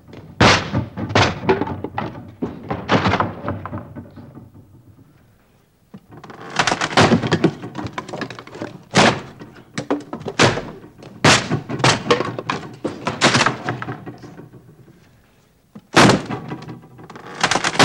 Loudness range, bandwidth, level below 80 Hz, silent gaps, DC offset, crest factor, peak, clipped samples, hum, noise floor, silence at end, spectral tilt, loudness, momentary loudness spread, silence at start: 7 LU; 16.5 kHz; -46 dBFS; none; under 0.1%; 20 dB; 0 dBFS; under 0.1%; none; -56 dBFS; 0 s; -4 dB/octave; -18 LUFS; 22 LU; 0.1 s